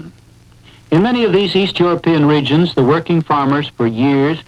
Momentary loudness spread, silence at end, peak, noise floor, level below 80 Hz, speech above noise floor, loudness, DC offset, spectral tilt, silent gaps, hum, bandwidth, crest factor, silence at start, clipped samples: 4 LU; 0.05 s; 0 dBFS; -44 dBFS; -48 dBFS; 31 dB; -14 LUFS; under 0.1%; -7.5 dB/octave; none; none; 10 kHz; 14 dB; 0 s; under 0.1%